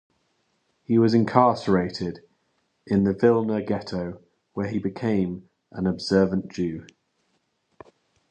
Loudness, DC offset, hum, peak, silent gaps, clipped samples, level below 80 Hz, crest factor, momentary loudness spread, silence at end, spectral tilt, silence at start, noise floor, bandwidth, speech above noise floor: -24 LUFS; under 0.1%; none; -2 dBFS; none; under 0.1%; -54 dBFS; 24 dB; 15 LU; 1.45 s; -7.5 dB/octave; 0.9 s; -71 dBFS; 9 kHz; 49 dB